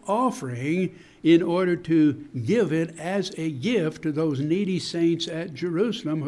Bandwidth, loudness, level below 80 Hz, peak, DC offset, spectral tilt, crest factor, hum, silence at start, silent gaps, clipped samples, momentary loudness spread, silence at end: 12 kHz; -24 LUFS; -64 dBFS; -8 dBFS; under 0.1%; -6.5 dB/octave; 16 dB; none; 0.05 s; none; under 0.1%; 9 LU; 0 s